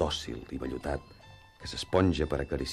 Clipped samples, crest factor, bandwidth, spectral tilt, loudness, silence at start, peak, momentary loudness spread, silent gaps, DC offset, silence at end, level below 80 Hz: under 0.1%; 20 dB; 13.5 kHz; -5.5 dB/octave; -32 LUFS; 0 s; -12 dBFS; 12 LU; none; under 0.1%; 0 s; -44 dBFS